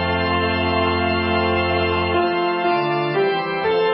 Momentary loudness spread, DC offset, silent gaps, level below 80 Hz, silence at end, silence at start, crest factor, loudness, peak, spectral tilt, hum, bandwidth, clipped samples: 1 LU; under 0.1%; none; -34 dBFS; 0 s; 0 s; 12 dB; -19 LUFS; -6 dBFS; -11 dB/octave; none; 5.6 kHz; under 0.1%